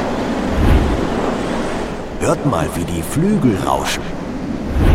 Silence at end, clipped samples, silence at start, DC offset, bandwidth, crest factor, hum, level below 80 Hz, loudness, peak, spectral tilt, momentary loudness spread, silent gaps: 0 s; under 0.1%; 0 s; under 0.1%; 16.5 kHz; 14 dB; none; -24 dBFS; -18 LUFS; -2 dBFS; -6 dB/octave; 9 LU; none